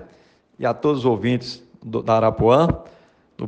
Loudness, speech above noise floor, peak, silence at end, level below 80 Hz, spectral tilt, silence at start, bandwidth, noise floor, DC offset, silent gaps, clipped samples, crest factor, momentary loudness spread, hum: -20 LUFS; 35 dB; -2 dBFS; 0 s; -46 dBFS; -7.5 dB/octave; 0 s; 8.8 kHz; -54 dBFS; under 0.1%; none; under 0.1%; 18 dB; 13 LU; none